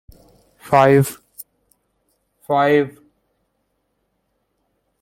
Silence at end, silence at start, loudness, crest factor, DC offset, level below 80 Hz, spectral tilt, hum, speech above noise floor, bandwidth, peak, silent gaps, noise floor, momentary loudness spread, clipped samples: 2.1 s; 0.65 s; -16 LUFS; 20 dB; under 0.1%; -58 dBFS; -6.5 dB/octave; none; 56 dB; 16.5 kHz; -2 dBFS; none; -70 dBFS; 25 LU; under 0.1%